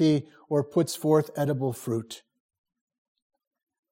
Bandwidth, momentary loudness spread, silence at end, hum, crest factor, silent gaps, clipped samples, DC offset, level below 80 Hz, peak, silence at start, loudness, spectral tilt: 16.5 kHz; 9 LU; 1.75 s; none; 18 dB; none; under 0.1%; under 0.1%; -72 dBFS; -10 dBFS; 0 s; -27 LUFS; -6.5 dB/octave